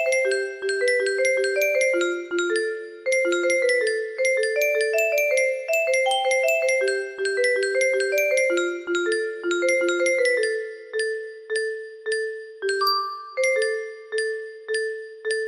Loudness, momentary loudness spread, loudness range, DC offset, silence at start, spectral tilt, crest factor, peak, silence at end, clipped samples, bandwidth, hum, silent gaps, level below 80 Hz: -23 LUFS; 9 LU; 4 LU; under 0.1%; 0 s; -0.5 dB/octave; 14 dB; -10 dBFS; 0 s; under 0.1%; 14.5 kHz; none; none; -72 dBFS